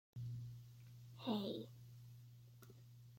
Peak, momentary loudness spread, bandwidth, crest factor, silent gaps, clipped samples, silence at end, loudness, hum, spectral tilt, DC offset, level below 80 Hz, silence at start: -30 dBFS; 18 LU; 16.5 kHz; 20 dB; none; under 0.1%; 0 s; -50 LUFS; none; -7 dB/octave; under 0.1%; -78 dBFS; 0.15 s